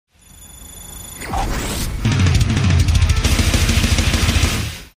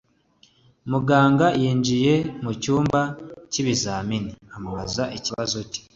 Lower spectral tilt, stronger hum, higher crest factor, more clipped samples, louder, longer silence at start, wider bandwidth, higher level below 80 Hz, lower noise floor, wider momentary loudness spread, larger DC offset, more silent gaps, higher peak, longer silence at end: about the same, -4.5 dB/octave vs -5 dB/octave; neither; second, 14 dB vs 20 dB; neither; first, -17 LUFS vs -22 LUFS; second, 0.4 s vs 0.85 s; first, 15.5 kHz vs 7.8 kHz; first, -22 dBFS vs -50 dBFS; second, -42 dBFS vs -59 dBFS; first, 17 LU vs 14 LU; neither; neither; about the same, -4 dBFS vs -4 dBFS; about the same, 0.15 s vs 0.15 s